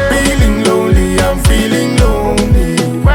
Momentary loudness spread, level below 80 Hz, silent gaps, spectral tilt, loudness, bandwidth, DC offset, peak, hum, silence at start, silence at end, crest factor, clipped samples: 2 LU; -16 dBFS; none; -5.5 dB/octave; -11 LUFS; 17.5 kHz; under 0.1%; 0 dBFS; none; 0 s; 0 s; 10 dB; under 0.1%